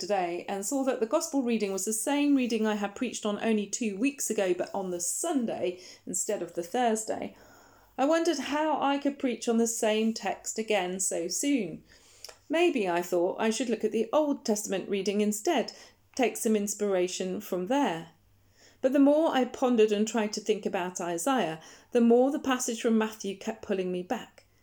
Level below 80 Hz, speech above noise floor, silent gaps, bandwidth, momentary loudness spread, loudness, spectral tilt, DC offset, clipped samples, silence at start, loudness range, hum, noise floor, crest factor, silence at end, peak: -72 dBFS; 34 dB; none; over 20 kHz; 9 LU; -29 LUFS; -3.5 dB/octave; under 0.1%; under 0.1%; 0 s; 3 LU; none; -62 dBFS; 16 dB; 0.4 s; -12 dBFS